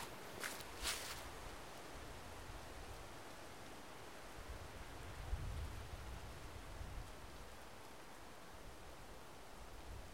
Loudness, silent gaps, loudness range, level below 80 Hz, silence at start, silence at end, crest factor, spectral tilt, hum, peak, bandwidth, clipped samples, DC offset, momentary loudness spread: -52 LUFS; none; 7 LU; -56 dBFS; 0 s; 0 s; 24 dB; -3 dB/octave; none; -28 dBFS; 16 kHz; under 0.1%; 0.1%; 10 LU